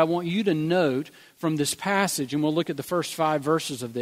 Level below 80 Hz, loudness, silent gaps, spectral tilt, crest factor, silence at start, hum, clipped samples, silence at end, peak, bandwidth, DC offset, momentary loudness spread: -68 dBFS; -25 LUFS; none; -4.5 dB/octave; 20 dB; 0 s; none; under 0.1%; 0 s; -6 dBFS; 16 kHz; under 0.1%; 6 LU